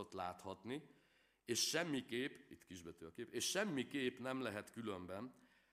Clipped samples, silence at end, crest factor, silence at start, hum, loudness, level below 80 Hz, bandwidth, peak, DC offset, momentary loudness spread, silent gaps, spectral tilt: under 0.1%; 0.4 s; 22 dB; 0 s; none; -44 LUFS; -84 dBFS; 15.5 kHz; -24 dBFS; under 0.1%; 17 LU; none; -3 dB/octave